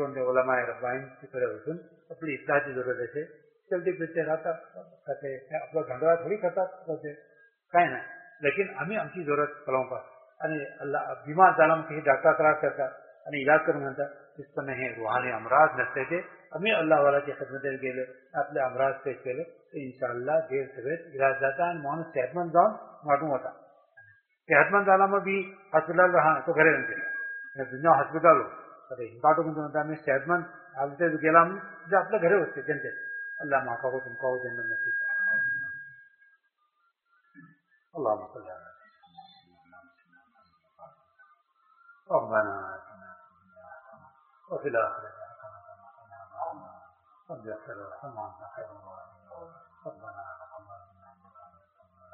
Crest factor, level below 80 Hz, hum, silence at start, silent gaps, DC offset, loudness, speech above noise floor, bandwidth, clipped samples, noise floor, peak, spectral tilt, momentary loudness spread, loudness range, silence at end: 26 dB; -76 dBFS; none; 0 s; none; under 0.1%; -27 LUFS; 46 dB; 4.2 kHz; under 0.1%; -73 dBFS; -4 dBFS; -4 dB/octave; 20 LU; 15 LU; 0.7 s